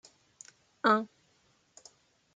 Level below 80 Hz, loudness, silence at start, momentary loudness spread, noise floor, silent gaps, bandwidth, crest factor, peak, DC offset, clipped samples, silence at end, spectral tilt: -80 dBFS; -29 LUFS; 0.85 s; 26 LU; -70 dBFS; none; 9.2 kHz; 24 dB; -12 dBFS; under 0.1%; under 0.1%; 1.3 s; -4.5 dB/octave